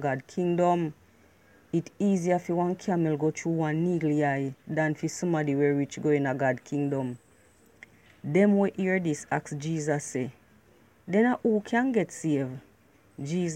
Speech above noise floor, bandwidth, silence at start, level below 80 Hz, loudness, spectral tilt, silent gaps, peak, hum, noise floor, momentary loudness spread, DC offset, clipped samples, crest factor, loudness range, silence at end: 34 dB; 13 kHz; 0 s; -70 dBFS; -28 LUFS; -7 dB/octave; none; -10 dBFS; none; -60 dBFS; 8 LU; under 0.1%; under 0.1%; 18 dB; 2 LU; 0 s